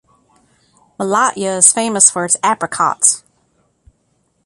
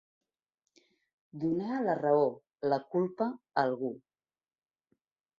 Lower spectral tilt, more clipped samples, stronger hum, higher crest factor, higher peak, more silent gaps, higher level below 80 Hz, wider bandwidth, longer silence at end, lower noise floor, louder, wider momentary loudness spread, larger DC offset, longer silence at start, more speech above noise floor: second, -1.5 dB/octave vs -8.5 dB/octave; neither; neither; about the same, 18 dB vs 20 dB; first, 0 dBFS vs -14 dBFS; neither; first, -60 dBFS vs -76 dBFS; first, 16 kHz vs 7 kHz; second, 1.25 s vs 1.4 s; second, -62 dBFS vs under -90 dBFS; first, -13 LUFS vs -32 LUFS; about the same, 8 LU vs 9 LU; neither; second, 1 s vs 1.35 s; second, 48 dB vs over 59 dB